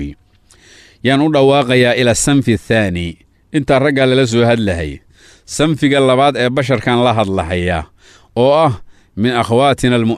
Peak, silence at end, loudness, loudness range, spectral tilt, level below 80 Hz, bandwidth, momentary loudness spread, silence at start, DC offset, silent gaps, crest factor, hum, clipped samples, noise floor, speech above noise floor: -2 dBFS; 0 s; -13 LUFS; 2 LU; -5.5 dB/octave; -40 dBFS; 14 kHz; 11 LU; 0 s; under 0.1%; none; 12 dB; none; under 0.1%; -49 dBFS; 36 dB